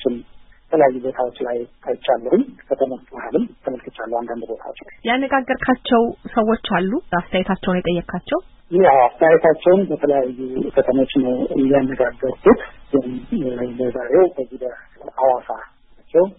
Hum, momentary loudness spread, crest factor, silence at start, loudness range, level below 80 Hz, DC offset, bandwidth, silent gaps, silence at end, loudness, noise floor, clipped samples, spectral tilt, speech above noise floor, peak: none; 14 LU; 18 dB; 0 s; 7 LU; -46 dBFS; under 0.1%; 4 kHz; none; 0.05 s; -19 LUFS; -44 dBFS; under 0.1%; -11.5 dB/octave; 26 dB; -2 dBFS